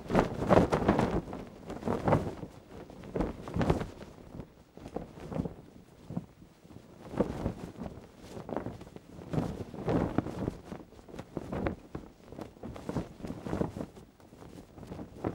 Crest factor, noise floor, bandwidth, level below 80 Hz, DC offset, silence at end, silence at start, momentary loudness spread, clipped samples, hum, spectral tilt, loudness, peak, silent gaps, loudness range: 28 dB; -55 dBFS; 16.5 kHz; -48 dBFS; under 0.1%; 0 s; 0 s; 21 LU; under 0.1%; none; -7.5 dB/octave; -34 LUFS; -6 dBFS; none; 8 LU